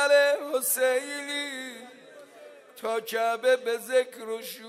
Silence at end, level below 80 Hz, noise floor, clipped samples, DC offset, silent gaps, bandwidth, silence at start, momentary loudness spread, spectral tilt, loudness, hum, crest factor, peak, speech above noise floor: 0 s; under -90 dBFS; -50 dBFS; under 0.1%; under 0.1%; none; 16 kHz; 0 s; 13 LU; -0.5 dB/octave; -27 LUFS; none; 18 dB; -10 dBFS; 23 dB